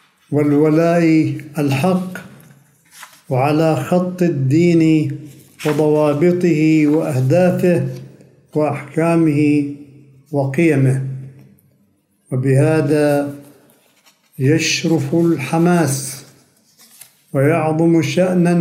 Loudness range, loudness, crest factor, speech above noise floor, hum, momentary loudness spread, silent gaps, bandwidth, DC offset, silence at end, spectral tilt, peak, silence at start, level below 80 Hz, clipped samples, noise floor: 4 LU; -16 LUFS; 14 dB; 45 dB; none; 11 LU; none; 16 kHz; under 0.1%; 0 s; -6.5 dB/octave; -2 dBFS; 0.3 s; -62 dBFS; under 0.1%; -59 dBFS